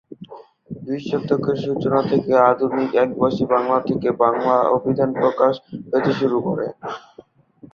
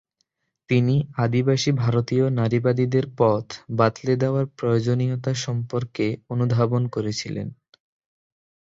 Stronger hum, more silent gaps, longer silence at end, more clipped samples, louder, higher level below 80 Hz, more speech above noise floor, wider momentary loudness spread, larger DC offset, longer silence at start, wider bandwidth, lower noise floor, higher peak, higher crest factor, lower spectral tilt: neither; neither; second, 0.05 s vs 1.15 s; neither; first, -19 LUFS vs -23 LUFS; about the same, -58 dBFS vs -56 dBFS; second, 29 dB vs 52 dB; first, 14 LU vs 7 LU; neither; second, 0.1 s vs 0.7 s; second, 6.8 kHz vs 7.8 kHz; second, -48 dBFS vs -73 dBFS; about the same, -2 dBFS vs -4 dBFS; about the same, 18 dB vs 18 dB; about the same, -8 dB/octave vs -7 dB/octave